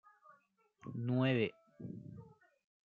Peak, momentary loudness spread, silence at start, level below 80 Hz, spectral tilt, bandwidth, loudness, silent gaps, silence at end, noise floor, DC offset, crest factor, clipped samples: -20 dBFS; 21 LU; 0.85 s; -80 dBFS; -9 dB/octave; 4.7 kHz; -37 LUFS; none; 0.6 s; -73 dBFS; under 0.1%; 20 dB; under 0.1%